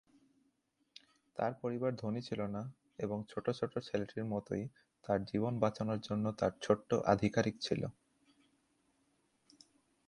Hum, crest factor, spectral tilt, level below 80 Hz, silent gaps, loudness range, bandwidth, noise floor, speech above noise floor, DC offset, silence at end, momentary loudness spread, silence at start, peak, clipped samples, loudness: none; 24 dB; -6.5 dB/octave; -66 dBFS; none; 5 LU; 11 kHz; -79 dBFS; 43 dB; under 0.1%; 2.15 s; 10 LU; 1.35 s; -14 dBFS; under 0.1%; -37 LUFS